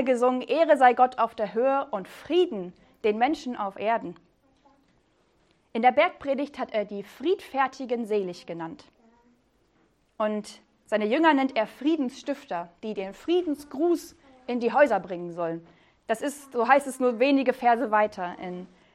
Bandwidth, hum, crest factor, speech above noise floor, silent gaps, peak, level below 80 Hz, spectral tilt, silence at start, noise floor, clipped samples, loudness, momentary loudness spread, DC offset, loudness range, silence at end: 14.5 kHz; none; 22 dB; 41 dB; none; -4 dBFS; -68 dBFS; -5 dB/octave; 0 s; -66 dBFS; under 0.1%; -26 LUFS; 14 LU; under 0.1%; 6 LU; 0.3 s